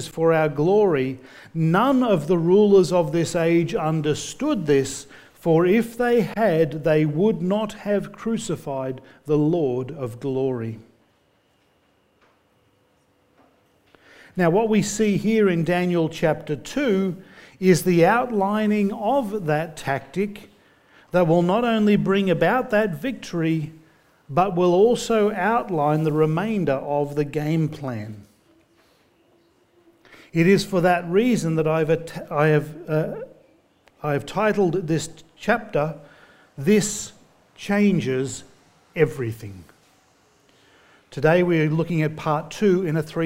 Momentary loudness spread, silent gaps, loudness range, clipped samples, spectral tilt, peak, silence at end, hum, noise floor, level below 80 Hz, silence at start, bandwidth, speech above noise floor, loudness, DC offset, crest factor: 12 LU; none; 7 LU; under 0.1%; -6.5 dB/octave; -4 dBFS; 0 s; none; -63 dBFS; -54 dBFS; 0 s; 16 kHz; 42 dB; -21 LUFS; under 0.1%; 18 dB